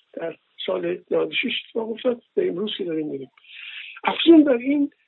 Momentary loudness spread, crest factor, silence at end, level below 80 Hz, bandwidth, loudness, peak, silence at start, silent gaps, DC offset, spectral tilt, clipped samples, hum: 20 LU; 20 dB; 0.2 s; -80 dBFS; 4.2 kHz; -22 LUFS; -4 dBFS; 0.15 s; none; under 0.1%; -9 dB/octave; under 0.1%; none